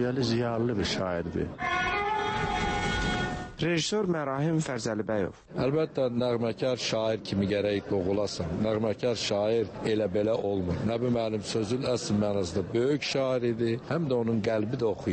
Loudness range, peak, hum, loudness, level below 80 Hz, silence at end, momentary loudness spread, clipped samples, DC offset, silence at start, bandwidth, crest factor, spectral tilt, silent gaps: 1 LU; -16 dBFS; none; -29 LUFS; -48 dBFS; 0 s; 3 LU; under 0.1%; under 0.1%; 0 s; 8.8 kHz; 14 dB; -5.5 dB/octave; none